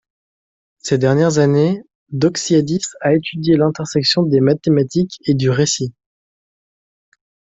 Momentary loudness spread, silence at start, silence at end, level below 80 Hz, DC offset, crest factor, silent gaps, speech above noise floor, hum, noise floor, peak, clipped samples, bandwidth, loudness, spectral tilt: 7 LU; 0.85 s; 1.65 s; -54 dBFS; under 0.1%; 14 dB; 1.95-2.06 s; over 75 dB; none; under -90 dBFS; -2 dBFS; under 0.1%; 8.2 kHz; -16 LUFS; -5.5 dB/octave